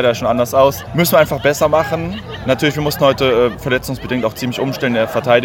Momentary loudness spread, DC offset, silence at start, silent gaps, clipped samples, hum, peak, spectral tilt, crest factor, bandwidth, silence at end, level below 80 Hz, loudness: 7 LU; under 0.1%; 0 s; none; under 0.1%; none; 0 dBFS; -5 dB/octave; 14 dB; 17 kHz; 0 s; -40 dBFS; -15 LUFS